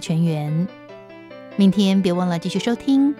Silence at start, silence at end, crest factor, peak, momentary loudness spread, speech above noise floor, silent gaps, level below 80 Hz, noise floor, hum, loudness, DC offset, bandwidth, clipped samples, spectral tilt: 0 s; 0 s; 16 dB; -4 dBFS; 23 LU; 22 dB; none; -60 dBFS; -40 dBFS; none; -20 LUFS; under 0.1%; 12 kHz; under 0.1%; -7 dB/octave